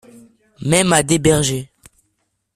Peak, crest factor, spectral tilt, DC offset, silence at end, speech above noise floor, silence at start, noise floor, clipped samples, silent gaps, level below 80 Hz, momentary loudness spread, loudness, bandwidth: 0 dBFS; 18 dB; -4 dB/octave; under 0.1%; 0.9 s; 54 dB; 0.6 s; -69 dBFS; under 0.1%; none; -44 dBFS; 12 LU; -16 LUFS; 14.5 kHz